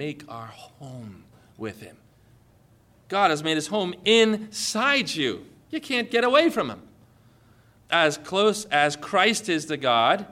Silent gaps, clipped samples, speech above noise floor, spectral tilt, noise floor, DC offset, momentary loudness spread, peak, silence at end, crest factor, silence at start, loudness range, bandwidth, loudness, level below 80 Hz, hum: none; under 0.1%; 34 dB; -3 dB/octave; -58 dBFS; under 0.1%; 21 LU; -6 dBFS; 0 s; 18 dB; 0 s; 7 LU; 16 kHz; -22 LUFS; -64 dBFS; none